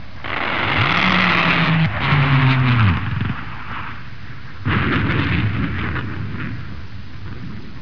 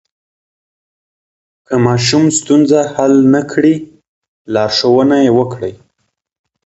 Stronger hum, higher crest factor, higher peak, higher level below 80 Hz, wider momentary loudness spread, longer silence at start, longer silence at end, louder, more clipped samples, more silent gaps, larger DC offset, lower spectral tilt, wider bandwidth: neither; about the same, 16 dB vs 14 dB; second, -4 dBFS vs 0 dBFS; first, -36 dBFS vs -50 dBFS; first, 19 LU vs 9 LU; second, 0 s vs 1.7 s; second, 0 s vs 0.9 s; second, -18 LUFS vs -11 LUFS; neither; second, none vs 4.08-4.22 s, 4.28-4.45 s; first, 4% vs under 0.1%; first, -7 dB/octave vs -5 dB/octave; second, 5.4 kHz vs 8.2 kHz